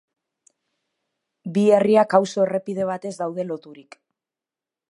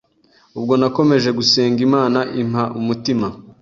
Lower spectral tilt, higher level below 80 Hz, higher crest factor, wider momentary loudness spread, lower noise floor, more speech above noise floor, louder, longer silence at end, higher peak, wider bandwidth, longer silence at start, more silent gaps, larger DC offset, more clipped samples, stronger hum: about the same, -6.5 dB/octave vs -5.5 dB/octave; second, -72 dBFS vs -54 dBFS; first, 22 dB vs 16 dB; first, 14 LU vs 7 LU; first, -89 dBFS vs -55 dBFS; first, 69 dB vs 39 dB; second, -21 LUFS vs -17 LUFS; first, 1.1 s vs 0.1 s; about the same, -2 dBFS vs -2 dBFS; first, 11 kHz vs 7.6 kHz; first, 1.45 s vs 0.55 s; neither; neither; neither; neither